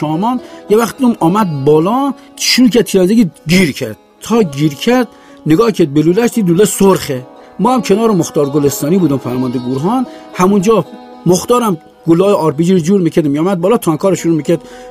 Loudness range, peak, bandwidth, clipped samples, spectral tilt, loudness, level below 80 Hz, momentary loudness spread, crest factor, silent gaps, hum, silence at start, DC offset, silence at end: 2 LU; 0 dBFS; 15.5 kHz; under 0.1%; -5.5 dB/octave; -12 LUFS; -46 dBFS; 8 LU; 12 dB; none; none; 0 s; under 0.1%; 0 s